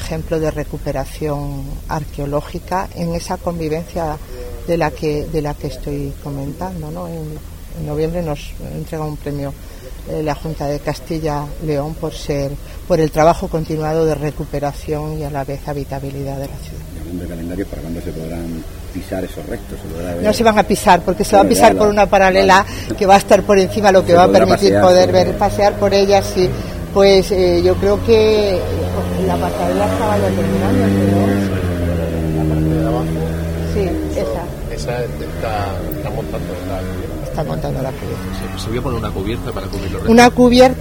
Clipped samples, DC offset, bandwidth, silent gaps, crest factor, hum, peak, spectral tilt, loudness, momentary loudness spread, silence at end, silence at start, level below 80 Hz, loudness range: under 0.1%; 0.4%; 16.5 kHz; none; 16 dB; none; 0 dBFS; -6 dB/octave; -16 LUFS; 15 LU; 0 s; 0 s; -30 dBFS; 13 LU